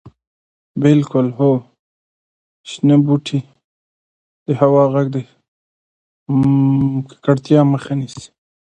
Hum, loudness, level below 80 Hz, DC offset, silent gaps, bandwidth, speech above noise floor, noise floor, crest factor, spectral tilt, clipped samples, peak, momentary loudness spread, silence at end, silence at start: none; -16 LUFS; -54 dBFS; under 0.1%; 0.27-0.75 s, 1.79-2.64 s, 3.64-4.46 s, 5.48-6.26 s; 9.2 kHz; over 76 dB; under -90 dBFS; 16 dB; -8.5 dB/octave; under 0.1%; 0 dBFS; 13 LU; 0.35 s; 0.05 s